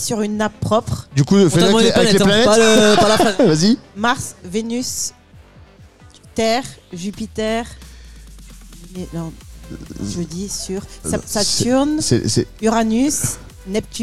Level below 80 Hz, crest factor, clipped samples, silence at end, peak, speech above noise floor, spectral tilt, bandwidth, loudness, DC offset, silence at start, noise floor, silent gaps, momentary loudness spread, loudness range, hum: -40 dBFS; 16 dB; under 0.1%; 0 s; -2 dBFS; 28 dB; -4 dB/octave; 15.5 kHz; -16 LUFS; under 0.1%; 0 s; -44 dBFS; none; 17 LU; 15 LU; none